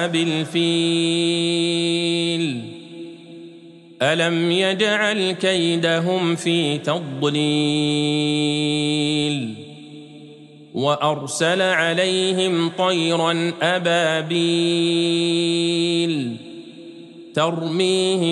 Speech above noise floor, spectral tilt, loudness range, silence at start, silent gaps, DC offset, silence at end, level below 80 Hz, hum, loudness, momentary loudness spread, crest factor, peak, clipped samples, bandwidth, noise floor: 24 dB; -4.5 dB/octave; 3 LU; 0 s; none; under 0.1%; 0 s; -70 dBFS; none; -19 LUFS; 18 LU; 16 dB; -4 dBFS; under 0.1%; 11.5 kHz; -43 dBFS